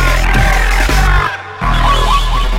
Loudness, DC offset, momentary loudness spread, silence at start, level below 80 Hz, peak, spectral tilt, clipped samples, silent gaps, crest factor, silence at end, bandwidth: -13 LUFS; under 0.1%; 5 LU; 0 s; -12 dBFS; 0 dBFS; -4 dB/octave; under 0.1%; none; 10 dB; 0 s; 15.5 kHz